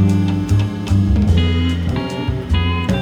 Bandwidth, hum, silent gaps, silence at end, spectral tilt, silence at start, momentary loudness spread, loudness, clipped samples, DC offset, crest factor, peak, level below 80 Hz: 10.5 kHz; none; none; 0 s; -7 dB/octave; 0 s; 6 LU; -17 LUFS; under 0.1%; under 0.1%; 14 dB; -2 dBFS; -24 dBFS